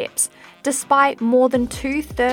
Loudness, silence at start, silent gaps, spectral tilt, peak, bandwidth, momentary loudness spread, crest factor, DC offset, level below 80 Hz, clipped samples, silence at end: -19 LUFS; 0 s; none; -3.5 dB/octave; -2 dBFS; 17.5 kHz; 8 LU; 16 dB; under 0.1%; -44 dBFS; under 0.1%; 0 s